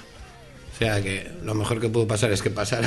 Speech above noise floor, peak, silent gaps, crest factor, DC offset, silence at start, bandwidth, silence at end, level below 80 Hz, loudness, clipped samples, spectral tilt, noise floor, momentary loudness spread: 20 dB; -6 dBFS; none; 20 dB; under 0.1%; 0 s; 12.5 kHz; 0 s; -44 dBFS; -25 LUFS; under 0.1%; -5 dB/octave; -44 dBFS; 22 LU